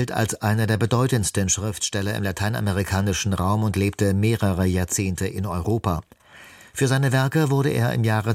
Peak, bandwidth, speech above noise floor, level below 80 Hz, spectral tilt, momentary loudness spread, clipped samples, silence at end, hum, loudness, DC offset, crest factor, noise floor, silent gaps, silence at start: -6 dBFS; 16 kHz; 25 dB; -44 dBFS; -5 dB/octave; 5 LU; under 0.1%; 0 s; none; -22 LUFS; under 0.1%; 16 dB; -47 dBFS; none; 0 s